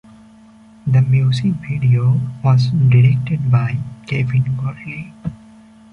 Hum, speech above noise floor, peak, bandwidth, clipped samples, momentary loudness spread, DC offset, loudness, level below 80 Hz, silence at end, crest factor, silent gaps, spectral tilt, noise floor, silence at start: none; 29 dB; -2 dBFS; 6.4 kHz; under 0.1%; 15 LU; under 0.1%; -16 LUFS; -46 dBFS; 0.55 s; 14 dB; none; -8.5 dB/octave; -44 dBFS; 0.85 s